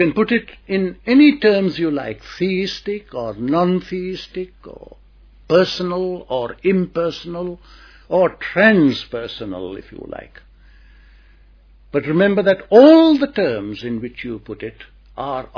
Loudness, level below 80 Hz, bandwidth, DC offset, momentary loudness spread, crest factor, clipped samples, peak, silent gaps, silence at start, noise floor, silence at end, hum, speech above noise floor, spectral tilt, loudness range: -17 LUFS; -48 dBFS; 5.4 kHz; under 0.1%; 18 LU; 18 dB; under 0.1%; 0 dBFS; none; 0 s; -48 dBFS; 0.1 s; none; 31 dB; -7 dB/octave; 8 LU